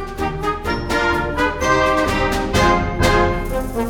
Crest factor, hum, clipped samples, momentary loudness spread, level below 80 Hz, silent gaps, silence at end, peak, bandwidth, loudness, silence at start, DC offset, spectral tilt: 16 dB; none; under 0.1%; 7 LU; -28 dBFS; none; 0 s; -2 dBFS; 20 kHz; -18 LUFS; 0 s; under 0.1%; -5 dB/octave